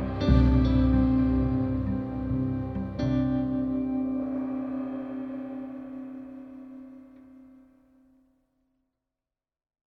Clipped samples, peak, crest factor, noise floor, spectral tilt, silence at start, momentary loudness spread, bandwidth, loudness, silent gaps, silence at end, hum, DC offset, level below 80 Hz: under 0.1%; -8 dBFS; 20 dB; under -90 dBFS; -10 dB/octave; 0 s; 20 LU; 6 kHz; -27 LUFS; none; 2.85 s; none; under 0.1%; -34 dBFS